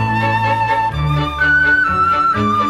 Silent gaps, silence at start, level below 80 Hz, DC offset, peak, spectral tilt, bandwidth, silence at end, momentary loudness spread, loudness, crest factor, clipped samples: none; 0 s; -32 dBFS; under 0.1%; -4 dBFS; -6 dB/octave; 13 kHz; 0 s; 6 LU; -14 LUFS; 10 dB; under 0.1%